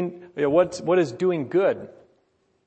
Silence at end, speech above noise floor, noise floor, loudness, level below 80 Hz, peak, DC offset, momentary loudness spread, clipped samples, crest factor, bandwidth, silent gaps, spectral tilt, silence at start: 0.8 s; 44 dB; -67 dBFS; -23 LUFS; -64 dBFS; -6 dBFS; under 0.1%; 7 LU; under 0.1%; 18 dB; 8.6 kHz; none; -6.5 dB/octave; 0 s